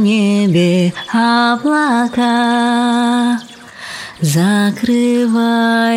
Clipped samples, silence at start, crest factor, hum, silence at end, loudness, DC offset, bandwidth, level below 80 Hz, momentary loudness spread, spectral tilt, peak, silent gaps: under 0.1%; 0 s; 10 dB; none; 0 s; -13 LUFS; under 0.1%; 15.5 kHz; -56 dBFS; 8 LU; -5.5 dB/octave; -4 dBFS; none